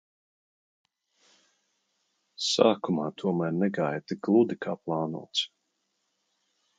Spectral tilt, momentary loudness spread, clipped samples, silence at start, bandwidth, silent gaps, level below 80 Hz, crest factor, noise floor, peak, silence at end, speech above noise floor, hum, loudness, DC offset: -5 dB/octave; 8 LU; under 0.1%; 2.4 s; 9.4 kHz; none; -78 dBFS; 24 dB; -78 dBFS; -6 dBFS; 1.3 s; 51 dB; none; -28 LUFS; under 0.1%